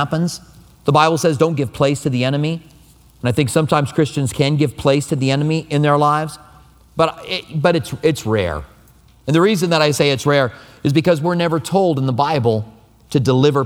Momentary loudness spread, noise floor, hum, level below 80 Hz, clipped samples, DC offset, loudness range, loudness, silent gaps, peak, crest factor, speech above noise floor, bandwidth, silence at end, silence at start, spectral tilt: 9 LU; -48 dBFS; none; -46 dBFS; under 0.1%; under 0.1%; 2 LU; -17 LUFS; none; 0 dBFS; 16 dB; 32 dB; 16.5 kHz; 0 s; 0 s; -6 dB/octave